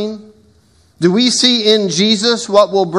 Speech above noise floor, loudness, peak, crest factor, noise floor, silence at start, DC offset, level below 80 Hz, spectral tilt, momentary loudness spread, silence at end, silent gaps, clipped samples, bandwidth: 38 dB; -12 LUFS; 0 dBFS; 14 dB; -51 dBFS; 0 s; under 0.1%; -60 dBFS; -3.5 dB/octave; 7 LU; 0 s; none; under 0.1%; 12 kHz